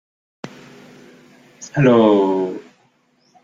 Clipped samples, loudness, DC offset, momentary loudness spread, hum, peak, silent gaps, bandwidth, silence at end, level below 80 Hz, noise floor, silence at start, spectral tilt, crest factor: under 0.1%; -16 LUFS; under 0.1%; 25 LU; none; -2 dBFS; none; 7.6 kHz; 0.85 s; -60 dBFS; -60 dBFS; 0.45 s; -7 dB/octave; 18 dB